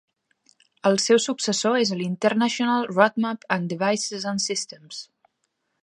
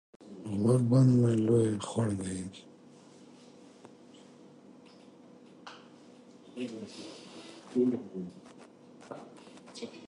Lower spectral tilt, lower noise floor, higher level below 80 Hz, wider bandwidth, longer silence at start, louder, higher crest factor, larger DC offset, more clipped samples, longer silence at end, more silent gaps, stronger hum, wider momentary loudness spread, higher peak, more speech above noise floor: second, -3.5 dB/octave vs -7.5 dB/octave; first, -75 dBFS vs -55 dBFS; second, -74 dBFS vs -66 dBFS; about the same, 11.5 kHz vs 11.5 kHz; first, 0.85 s vs 0.25 s; first, -23 LUFS vs -29 LUFS; about the same, 22 dB vs 20 dB; neither; neither; first, 0.8 s vs 0 s; neither; neither; second, 9 LU vs 27 LU; first, -2 dBFS vs -14 dBFS; first, 52 dB vs 27 dB